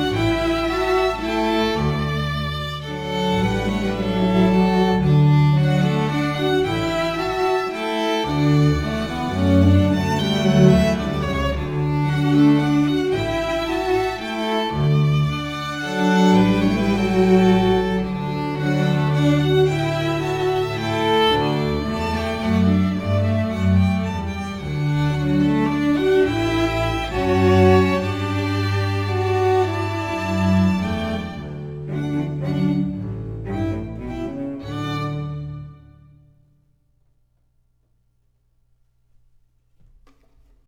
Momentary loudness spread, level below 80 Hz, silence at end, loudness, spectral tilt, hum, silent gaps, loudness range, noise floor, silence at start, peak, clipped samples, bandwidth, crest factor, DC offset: 11 LU; -38 dBFS; 4.9 s; -20 LUFS; -7 dB/octave; 60 Hz at -50 dBFS; none; 8 LU; -63 dBFS; 0 s; -2 dBFS; under 0.1%; 14 kHz; 18 dB; under 0.1%